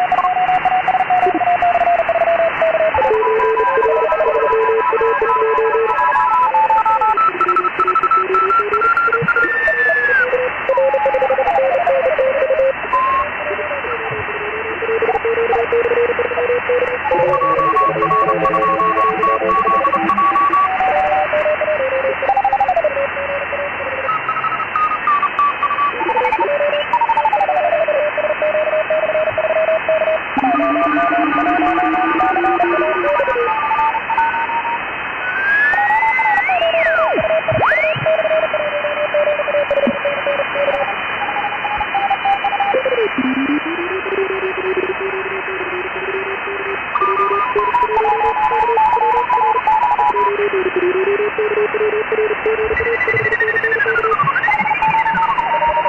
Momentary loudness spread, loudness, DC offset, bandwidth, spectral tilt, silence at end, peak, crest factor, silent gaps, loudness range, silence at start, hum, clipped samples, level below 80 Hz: 6 LU; -15 LUFS; under 0.1%; 8 kHz; -6 dB/octave; 0 s; -6 dBFS; 10 dB; none; 4 LU; 0 s; none; under 0.1%; -48 dBFS